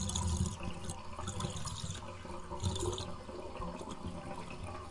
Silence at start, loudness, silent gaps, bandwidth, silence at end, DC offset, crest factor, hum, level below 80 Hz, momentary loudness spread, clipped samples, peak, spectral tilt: 0 s; -41 LUFS; none; 11.5 kHz; 0 s; under 0.1%; 18 dB; none; -50 dBFS; 9 LU; under 0.1%; -20 dBFS; -4.5 dB/octave